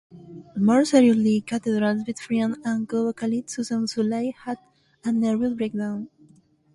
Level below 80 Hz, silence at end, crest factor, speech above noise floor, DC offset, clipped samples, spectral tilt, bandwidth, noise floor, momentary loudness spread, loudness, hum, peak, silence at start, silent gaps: -64 dBFS; 0.7 s; 18 dB; 34 dB; under 0.1%; under 0.1%; -6 dB/octave; 11.5 kHz; -57 dBFS; 17 LU; -23 LUFS; none; -4 dBFS; 0.15 s; none